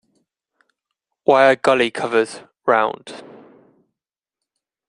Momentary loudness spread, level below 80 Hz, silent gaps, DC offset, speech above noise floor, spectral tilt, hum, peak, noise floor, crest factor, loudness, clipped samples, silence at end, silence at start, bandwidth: 19 LU; -68 dBFS; none; under 0.1%; 70 dB; -4.5 dB/octave; none; -2 dBFS; -86 dBFS; 20 dB; -17 LUFS; under 0.1%; 1.7 s; 1.3 s; 11 kHz